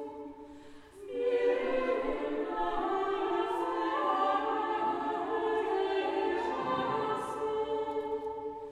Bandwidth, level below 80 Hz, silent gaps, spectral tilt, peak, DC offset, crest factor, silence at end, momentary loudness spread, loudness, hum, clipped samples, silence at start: 12 kHz; -58 dBFS; none; -5.5 dB/octave; -18 dBFS; under 0.1%; 14 dB; 0 s; 10 LU; -32 LUFS; none; under 0.1%; 0 s